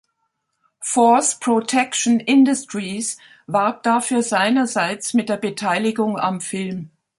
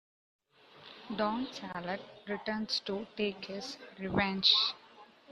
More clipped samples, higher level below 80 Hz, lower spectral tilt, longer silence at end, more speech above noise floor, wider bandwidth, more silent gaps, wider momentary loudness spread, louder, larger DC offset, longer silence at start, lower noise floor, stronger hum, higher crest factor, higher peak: neither; about the same, -68 dBFS vs -66 dBFS; about the same, -3.5 dB/octave vs -4 dB/octave; first, 0.3 s vs 0 s; first, 54 dB vs 23 dB; about the same, 11.5 kHz vs 12 kHz; neither; second, 12 LU vs 17 LU; first, -19 LUFS vs -33 LUFS; neither; about the same, 0.8 s vs 0.75 s; first, -73 dBFS vs -58 dBFS; neither; second, 16 dB vs 24 dB; first, -2 dBFS vs -12 dBFS